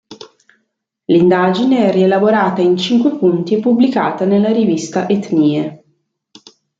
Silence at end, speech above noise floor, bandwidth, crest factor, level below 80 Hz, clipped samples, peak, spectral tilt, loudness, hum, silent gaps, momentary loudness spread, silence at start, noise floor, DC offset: 1.05 s; 57 dB; 7.8 kHz; 12 dB; -60 dBFS; under 0.1%; -2 dBFS; -6.5 dB/octave; -13 LUFS; none; none; 5 LU; 0.1 s; -70 dBFS; under 0.1%